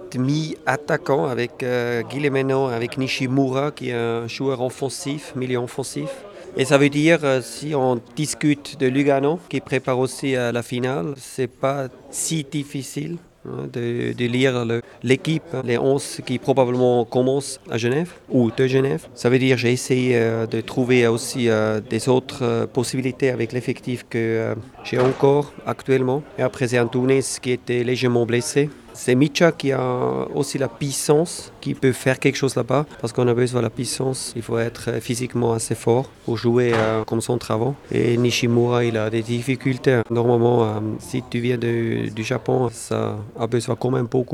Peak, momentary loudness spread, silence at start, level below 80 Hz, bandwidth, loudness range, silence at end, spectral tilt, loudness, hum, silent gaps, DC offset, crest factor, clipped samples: -2 dBFS; 9 LU; 0 s; -56 dBFS; 15 kHz; 4 LU; 0 s; -5.5 dB/octave; -21 LUFS; none; none; under 0.1%; 20 dB; under 0.1%